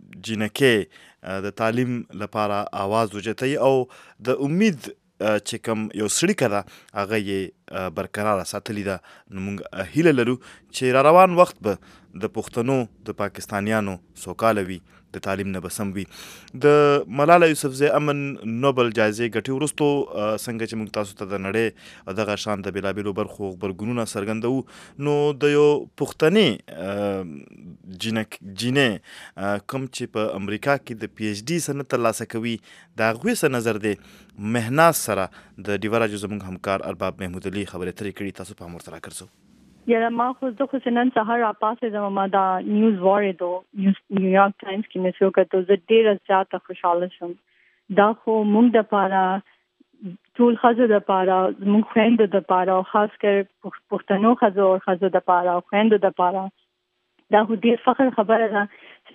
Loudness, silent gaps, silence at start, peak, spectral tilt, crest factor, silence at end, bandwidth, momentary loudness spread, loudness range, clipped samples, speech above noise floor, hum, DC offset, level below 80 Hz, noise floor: -22 LUFS; none; 0.15 s; 0 dBFS; -5.5 dB/octave; 22 dB; 0.5 s; 15.5 kHz; 15 LU; 7 LU; under 0.1%; 52 dB; none; under 0.1%; -62 dBFS; -74 dBFS